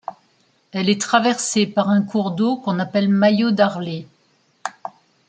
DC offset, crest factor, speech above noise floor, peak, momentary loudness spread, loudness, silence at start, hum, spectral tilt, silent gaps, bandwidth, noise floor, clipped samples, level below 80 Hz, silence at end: under 0.1%; 18 dB; 43 dB; -2 dBFS; 16 LU; -19 LUFS; 0.75 s; none; -5 dB/octave; none; 9.4 kHz; -61 dBFS; under 0.1%; -66 dBFS; 0.4 s